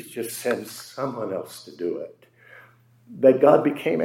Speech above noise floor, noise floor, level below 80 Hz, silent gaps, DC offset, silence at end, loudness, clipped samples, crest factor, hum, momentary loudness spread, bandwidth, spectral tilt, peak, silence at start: 31 dB; -54 dBFS; -78 dBFS; none; under 0.1%; 0 s; -23 LUFS; under 0.1%; 20 dB; none; 18 LU; 16.5 kHz; -5.5 dB/octave; -2 dBFS; 0 s